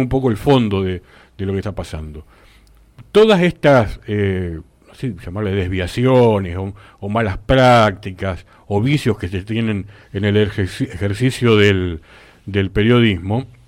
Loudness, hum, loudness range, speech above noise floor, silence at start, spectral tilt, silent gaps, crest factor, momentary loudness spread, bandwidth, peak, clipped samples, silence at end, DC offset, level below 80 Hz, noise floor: -17 LUFS; none; 3 LU; 32 dB; 0 s; -7 dB/octave; none; 14 dB; 15 LU; 15.5 kHz; -2 dBFS; under 0.1%; 0.2 s; under 0.1%; -38 dBFS; -48 dBFS